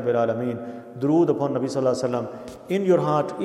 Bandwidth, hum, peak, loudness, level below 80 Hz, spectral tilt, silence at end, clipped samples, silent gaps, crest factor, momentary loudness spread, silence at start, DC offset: 12.5 kHz; none; -8 dBFS; -23 LUFS; -66 dBFS; -7.5 dB/octave; 0 s; under 0.1%; none; 14 dB; 14 LU; 0 s; under 0.1%